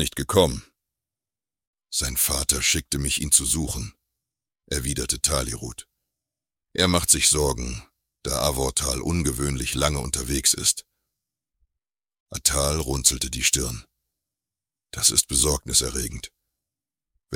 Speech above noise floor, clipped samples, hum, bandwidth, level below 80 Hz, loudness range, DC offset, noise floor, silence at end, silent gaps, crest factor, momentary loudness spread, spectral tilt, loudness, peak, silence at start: over 66 dB; under 0.1%; none; 18 kHz; -36 dBFS; 2 LU; under 0.1%; under -90 dBFS; 0 s; 1.67-1.73 s, 12.20-12.26 s; 22 dB; 15 LU; -2.5 dB/octave; -22 LUFS; -2 dBFS; 0 s